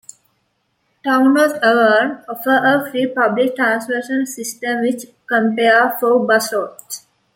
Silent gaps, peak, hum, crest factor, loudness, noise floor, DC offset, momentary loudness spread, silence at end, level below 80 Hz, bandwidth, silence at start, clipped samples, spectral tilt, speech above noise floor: none; -2 dBFS; none; 14 dB; -16 LUFS; -67 dBFS; under 0.1%; 11 LU; 0.4 s; -68 dBFS; 17 kHz; 1.05 s; under 0.1%; -3.5 dB/octave; 51 dB